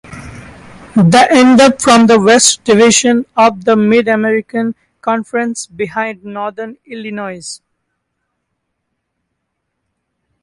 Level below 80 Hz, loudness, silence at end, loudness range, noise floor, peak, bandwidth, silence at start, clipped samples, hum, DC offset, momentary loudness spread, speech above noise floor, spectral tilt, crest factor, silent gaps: -50 dBFS; -10 LUFS; 2.85 s; 20 LU; -71 dBFS; 0 dBFS; 11.5 kHz; 0.1 s; under 0.1%; none; under 0.1%; 20 LU; 61 dB; -4 dB/octave; 12 dB; none